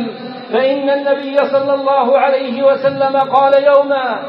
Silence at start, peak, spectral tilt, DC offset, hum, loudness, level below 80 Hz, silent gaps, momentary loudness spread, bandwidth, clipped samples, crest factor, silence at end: 0 s; 0 dBFS; -7 dB/octave; under 0.1%; none; -13 LUFS; -76 dBFS; none; 6 LU; 5.4 kHz; under 0.1%; 12 dB; 0 s